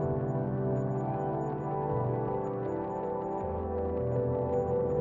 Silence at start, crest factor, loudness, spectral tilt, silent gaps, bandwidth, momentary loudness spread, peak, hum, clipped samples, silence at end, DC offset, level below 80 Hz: 0 s; 12 dB; -32 LUFS; -11 dB/octave; none; 7.2 kHz; 4 LU; -18 dBFS; none; under 0.1%; 0 s; under 0.1%; -52 dBFS